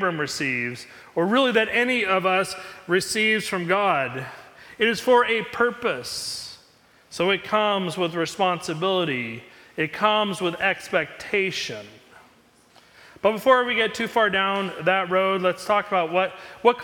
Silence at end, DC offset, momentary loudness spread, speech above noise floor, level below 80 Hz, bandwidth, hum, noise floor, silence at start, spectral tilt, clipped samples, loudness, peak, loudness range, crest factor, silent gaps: 0 s; under 0.1%; 11 LU; 33 dB; -64 dBFS; 19 kHz; none; -56 dBFS; 0 s; -4 dB/octave; under 0.1%; -23 LUFS; -4 dBFS; 4 LU; 20 dB; none